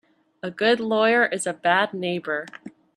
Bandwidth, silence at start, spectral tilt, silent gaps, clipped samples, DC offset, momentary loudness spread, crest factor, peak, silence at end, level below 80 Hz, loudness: 12.5 kHz; 0.45 s; -3.5 dB/octave; none; under 0.1%; under 0.1%; 16 LU; 18 dB; -6 dBFS; 0.3 s; -74 dBFS; -22 LUFS